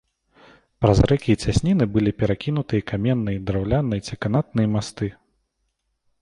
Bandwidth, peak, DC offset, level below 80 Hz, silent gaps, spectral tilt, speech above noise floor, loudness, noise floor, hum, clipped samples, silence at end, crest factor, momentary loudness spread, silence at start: 11 kHz; -2 dBFS; under 0.1%; -36 dBFS; none; -7 dB/octave; 53 dB; -22 LUFS; -73 dBFS; none; under 0.1%; 1.1 s; 20 dB; 7 LU; 0.8 s